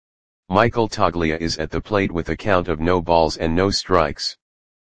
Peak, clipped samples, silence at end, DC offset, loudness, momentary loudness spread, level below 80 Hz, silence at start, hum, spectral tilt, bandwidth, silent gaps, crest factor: 0 dBFS; under 0.1%; 0.45 s; 2%; -20 LUFS; 6 LU; -38 dBFS; 0.45 s; none; -5 dB/octave; 9.8 kHz; none; 20 dB